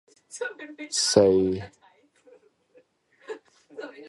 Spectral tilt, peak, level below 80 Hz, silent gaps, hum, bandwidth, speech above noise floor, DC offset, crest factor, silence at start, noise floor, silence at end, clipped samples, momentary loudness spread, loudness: -3.5 dB/octave; -4 dBFS; -58 dBFS; none; none; 11.5 kHz; 37 dB; under 0.1%; 24 dB; 0.35 s; -61 dBFS; 0 s; under 0.1%; 24 LU; -24 LUFS